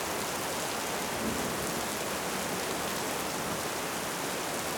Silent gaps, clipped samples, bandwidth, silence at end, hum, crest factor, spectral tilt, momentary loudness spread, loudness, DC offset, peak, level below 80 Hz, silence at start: none; under 0.1%; over 20 kHz; 0 s; none; 16 dB; -2.5 dB/octave; 1 LU; -32 LUFS; under 0.1%; -16 dBFS; -56 dBFS; 0 s